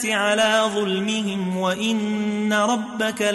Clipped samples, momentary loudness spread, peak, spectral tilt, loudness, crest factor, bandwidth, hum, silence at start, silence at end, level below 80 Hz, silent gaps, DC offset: under 0.1%; 6 LU; -8 dBFS; -4 dB/octave; -21 LUFS; 14 dB; 12 kHz; none; 0 s; 0 s; -64 dBFS; none; under 0.1%